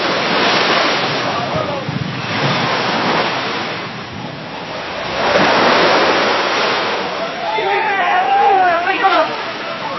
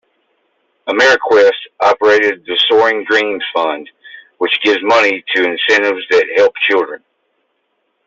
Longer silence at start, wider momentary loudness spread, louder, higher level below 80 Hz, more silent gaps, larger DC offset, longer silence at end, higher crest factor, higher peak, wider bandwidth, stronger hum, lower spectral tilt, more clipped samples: second, 0 s vs 0.85 s; first, 12 LU vs 9 LU; second, -15 LUFS vs -12 LUFS; first, -50 dBFS vs -62 dBFS; neither; neither; second, 0 s vs 1.1 s; about the same, 16 dB vs 12 dB; about the same, 0 dBFS vs -2 dBFS; second, 6.2 kHz vs 7.8 kHz; neither; first, -4 dB/octave vs -2.5 dB/octave; neither